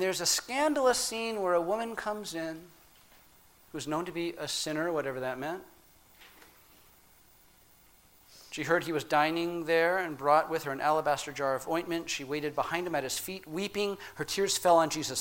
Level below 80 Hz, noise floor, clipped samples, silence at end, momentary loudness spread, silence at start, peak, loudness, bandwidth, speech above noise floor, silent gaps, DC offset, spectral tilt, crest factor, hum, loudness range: -66 dBFS; -61 dBFS; under 0.1%; 0 s; 11 LU; 0 s; -10 dBFS; -30 LUFS; 17 kHz; 30 dB; none; under 0.1%; -3 dB/octave; 20 dB; none; 9 LU